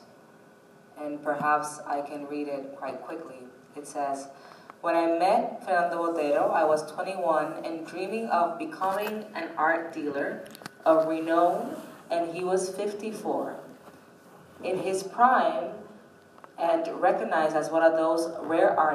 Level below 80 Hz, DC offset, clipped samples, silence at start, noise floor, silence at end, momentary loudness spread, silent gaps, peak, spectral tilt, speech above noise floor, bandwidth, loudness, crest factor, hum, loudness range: -84 dBFS; under 0.1%; under 0.1%; 0 s; -54 dBFS; 0 s; 15 LU; none; -8 dBFS; -4.5 dB/octave; 28 dB; 15.5 kHz; -27 LUFS; 20 dB; none; 6 LU